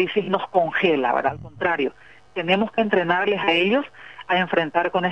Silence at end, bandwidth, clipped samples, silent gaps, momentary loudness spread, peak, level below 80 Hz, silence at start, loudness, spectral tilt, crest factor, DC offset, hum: 0 s; 8.4 kHz; under 0.1%; none; 8 LU; -4 dBFS; -60 dBFS; 0 s; -21 LUFS; -7 dB/octave; 18 dB; 0.2%; none